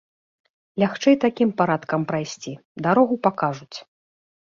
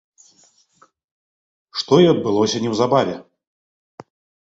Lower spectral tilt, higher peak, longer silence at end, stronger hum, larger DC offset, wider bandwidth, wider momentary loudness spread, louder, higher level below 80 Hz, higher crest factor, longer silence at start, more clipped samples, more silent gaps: about the same, -6 dB/octave vs -5.5 dB/octave; about the same, -2 dBFS vs -2 dBFS; second, 0.7 s vs 1.3 s; neither; neither; about the same, 7.4 kHz vs 8 kHz; first, 17 LU vs 14 LU; second, -21 LUFS vs -18 LUFS; second, -66 dBFS vs -60 dBFS; about the same, 20 dB vs 20 dB; second, 0.75 s vs 1.75 s; neither; first, 2.65-2.75 s vs none